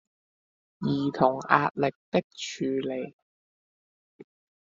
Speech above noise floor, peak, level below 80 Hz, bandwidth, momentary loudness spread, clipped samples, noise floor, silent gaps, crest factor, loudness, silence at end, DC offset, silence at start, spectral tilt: over 63 dB; -2 dBFS; -70 dBFS; 7.6 kHz; 12 LU; under 0.1%; under -90 dBFS; 1.96-2.12 s, 2.24-2.30 s, 3.13-4.19 s; 28 dB; -27 LUFS; 0.4 s; under 0.1%; 0.8 s; -4.5 dB/octave